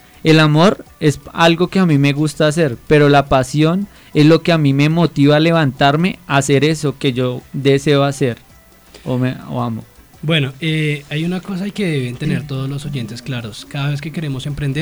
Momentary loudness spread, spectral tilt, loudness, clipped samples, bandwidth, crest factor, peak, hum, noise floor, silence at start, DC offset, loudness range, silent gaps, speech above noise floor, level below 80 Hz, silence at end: 12 LU; -6 dB/octave; -15 LUFS; under 0.1%; over 20 kHz; 12 dB; -2 dBFS; none; -44 dBFS; 0.25 s; under 0.1%; 8 LU; none; 29 dB; -44 dBFS; 0 s